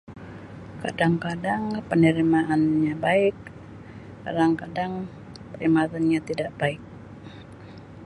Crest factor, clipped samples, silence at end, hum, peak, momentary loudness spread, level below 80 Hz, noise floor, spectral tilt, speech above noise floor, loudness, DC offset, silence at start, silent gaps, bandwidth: 18 dB; under 0.1%; 0 s; none; -6 dBFS; 22 LU; -54 dBFS; -43 dBFS; -7.5 dB/octave; 20 dB; -24 LUFS; under 0.1%; 0.1 s; none; 11 kHz